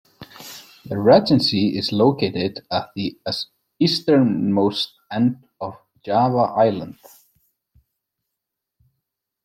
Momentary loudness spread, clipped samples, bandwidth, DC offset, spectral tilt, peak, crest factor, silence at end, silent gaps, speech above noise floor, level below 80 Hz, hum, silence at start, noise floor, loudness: 19 LU; under 0.1%; 16 kHz; under 0.1%; -6.5 dB/octave; -2 dBFS; 20 dB; 2.55 s; none; 63 dB; -60 dBFS; none; 0.2 s; -82 dBFS; -19 LUFS